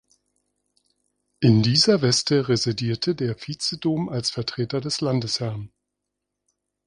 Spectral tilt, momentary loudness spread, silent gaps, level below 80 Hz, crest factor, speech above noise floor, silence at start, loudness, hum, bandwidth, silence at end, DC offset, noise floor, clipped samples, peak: -5 dB/octave; 10 LU; none; -58 dBFS; 20 dB; 60 dB; 1.4 s; -22 LUFS; 50 Hz at -50 dBFS; 11 kHz; 1.2 s; under 0.1%; -82 dBFS; under 0.1%; -4 dBFS